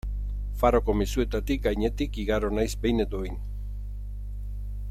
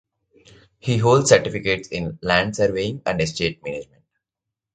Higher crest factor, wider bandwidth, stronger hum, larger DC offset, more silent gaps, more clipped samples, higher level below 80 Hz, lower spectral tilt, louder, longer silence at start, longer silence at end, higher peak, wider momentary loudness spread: about the same, 20 dB vs 22 dB; first, 14 kHz vs 9.4 kHz; first, 50 Hz at -30 dBFS vs none; neither; neither; neither; first, -32 dBFS vs -48 dBFS; first, -6.5 dB/octave vs -4.5 dB/octave; second, -28 LUFS vs -20 LUFS; second, 0.05 s vs 0.85 s; second, 0 s vs 0.9 s; second, -8 dBFS vs 0 dBFS; about the same, 14 LU vs 15 LU